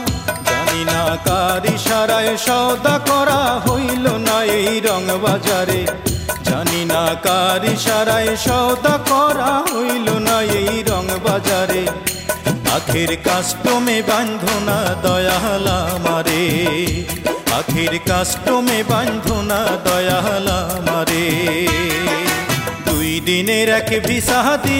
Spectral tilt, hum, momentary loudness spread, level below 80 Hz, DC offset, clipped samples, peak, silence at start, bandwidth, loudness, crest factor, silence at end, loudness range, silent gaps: -4 dB/octave; none; 4 LU; -36 dBFS; under 0.1%; under 0.1%; -2 dBFS; 0 s; 16.5 kHz; -16 LUFS; 14 dB; 0 s; 2 LU; none